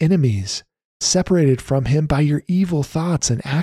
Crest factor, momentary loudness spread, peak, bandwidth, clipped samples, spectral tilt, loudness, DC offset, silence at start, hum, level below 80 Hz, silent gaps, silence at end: 12 dB; 6 LU; -6 dBFS; 13 kHz; under 0.1%; -5.5 dB/octave; -19 LUFS; under 0.1%; 0 s; none; -40 dBFS; 0.85-1.00 s; 0 s